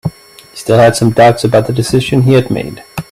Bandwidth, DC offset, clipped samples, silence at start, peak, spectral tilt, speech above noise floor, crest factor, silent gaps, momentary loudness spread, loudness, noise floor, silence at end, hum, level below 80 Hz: 15 kHz; under 0.1%; under 0.1%; 0.05 s; 0 dBFS; -6 dB/octave; 26 dB; 10 dB; none; 15 LU; -10 LUFS; -36 dBFS; 0.1 s; none; -40 dBFS